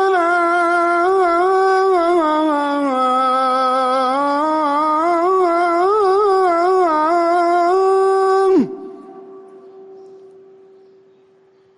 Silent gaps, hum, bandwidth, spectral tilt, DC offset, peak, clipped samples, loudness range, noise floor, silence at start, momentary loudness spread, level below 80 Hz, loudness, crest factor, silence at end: none; none; 11 kHz; -4.5 dB/octave; under 0.1%; -6 dBFS; under 0.1%; 5 LU; -52 dBFS; 0 s; 3 LU; -60 dBFS; -15 LUFS; 10 dB; 1.6 s